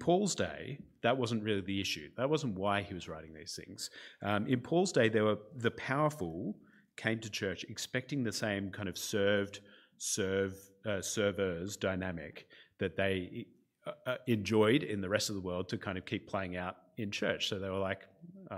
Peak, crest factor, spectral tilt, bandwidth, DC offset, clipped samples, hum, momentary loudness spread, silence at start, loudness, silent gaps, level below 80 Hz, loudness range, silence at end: -14 dBFS; 22 dB; -4.5 dB/octave; 16 kHz; under 0.1%; under 0.1%; none; 14 LU; 0 s; -35 LUFS; none; -68 dBFS; 3 LU; 0 s